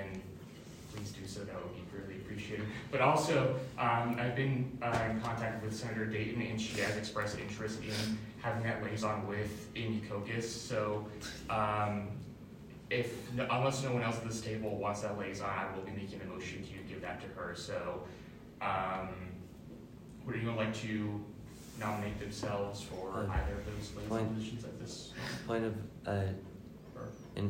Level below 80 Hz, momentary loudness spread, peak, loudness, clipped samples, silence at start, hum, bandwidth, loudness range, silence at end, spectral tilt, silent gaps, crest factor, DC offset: -56 dBFS; 14 LU; -14 dBFS; -38 LUFS; under 0.1%; 0 s; none; 16 kHz; 7 LU; 0 s; -5.5 dB/octave; none; 22 dB; under 0.1%